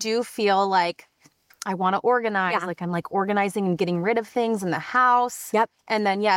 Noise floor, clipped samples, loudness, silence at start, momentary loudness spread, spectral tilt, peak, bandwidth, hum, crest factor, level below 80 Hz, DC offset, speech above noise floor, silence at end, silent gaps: -59 dBFS; under 0.1%; -23 LUFS; 0 s; 7 LU; -5 dB/octave; -8 dBFS; 16.5 kHz; none; 16 dB; -72 dBFS; under 0.1%; 36 dB; 0 s; none